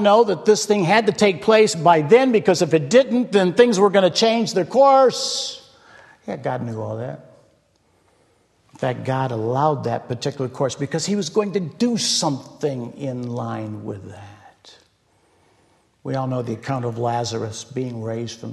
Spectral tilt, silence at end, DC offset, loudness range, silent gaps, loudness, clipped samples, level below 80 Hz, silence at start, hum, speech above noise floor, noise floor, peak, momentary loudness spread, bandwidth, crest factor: -4.5 dB/octave; 0 s; under 0.1%; 15 LU; none; -19 LUFS; under 0.1%; -64 dBFS; 0 s; none; 42 dB; -61 dBFS; 0 dBFS; 14 LU; 12.5 kHz; 20 dB